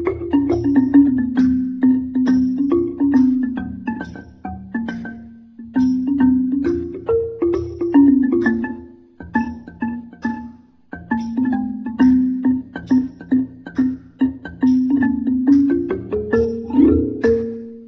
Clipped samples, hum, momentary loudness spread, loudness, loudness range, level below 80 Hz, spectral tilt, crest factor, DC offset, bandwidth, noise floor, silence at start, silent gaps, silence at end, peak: under 0.1%; none; 13 LU; -18 LUFS; 5 LU; -40 dBFS; -9 dB/octave; 16 dB; under 0.1%; 6 kHz; -40 dBFS; 0 s; none; 0 s; -2 dBFS